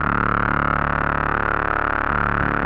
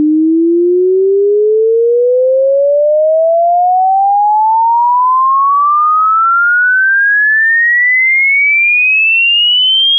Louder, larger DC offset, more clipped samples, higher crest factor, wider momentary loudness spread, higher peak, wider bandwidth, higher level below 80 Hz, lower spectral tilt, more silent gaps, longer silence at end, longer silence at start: second, -20 LUFS vs -8 LUFS; neither; neither; first, 14 dB vs 4 dB; second, 1 LU vs 4 LU; about the same, -6 dBFS vs -6 dBFS; first, 5.8 kHz vs 3.5 kHz; first, -32 dBFS vs under -90 dBFS; first, -9 dB/octave vs 5 dB/octave; neither; about the same, 0 s vs 0 s; about the same, 0 s vs 0 s